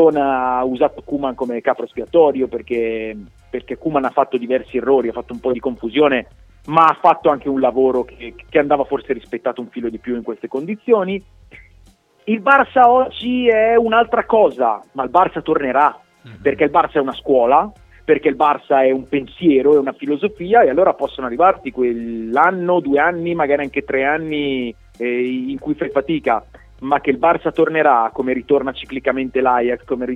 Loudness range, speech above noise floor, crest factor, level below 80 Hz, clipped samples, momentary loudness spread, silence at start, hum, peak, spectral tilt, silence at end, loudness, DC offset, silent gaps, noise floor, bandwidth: 5 LU; 34 dB; 16 dB; -48 dBFS; under 0.1%; 11 LU; 0 s; none; 0 dBFS; -7.5 dB/octave; 0 s; -17 LUFS; under 0.1%; none; -50 dBFS; 5.8 kHz